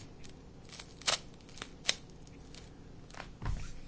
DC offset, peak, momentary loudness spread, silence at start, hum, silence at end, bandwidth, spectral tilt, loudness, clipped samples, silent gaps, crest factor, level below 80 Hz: under 0.1%; -10 dBFS; 20 LU; 0 s; none; 0 s; 8 kHz; -2 dB/octave; -38 LUFS; under 0.1%; none; 32 dB; -50 dBFS